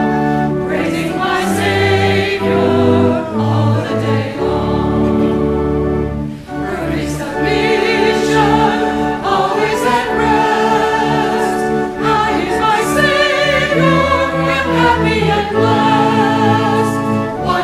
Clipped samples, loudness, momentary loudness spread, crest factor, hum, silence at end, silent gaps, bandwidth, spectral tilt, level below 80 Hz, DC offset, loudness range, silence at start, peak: under 0.1%; -14 LUFS; 5 LU; 14 dB; none; 0 s; none; 15.5 kHz; -6 dB/octave; -34 dBFS; under 0.1%; 3 LU; 0 s; 0 dBFS